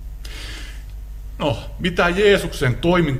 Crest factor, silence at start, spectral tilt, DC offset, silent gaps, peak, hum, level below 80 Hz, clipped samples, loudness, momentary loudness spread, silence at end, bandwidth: 18 dB; 0 s; -5.5 dB/octave; under 0.1%; none; -2 dBFS; none; -32 dBFS; under 0.1%; -19 LUFS; 21 LU; 0 s; 16 kHz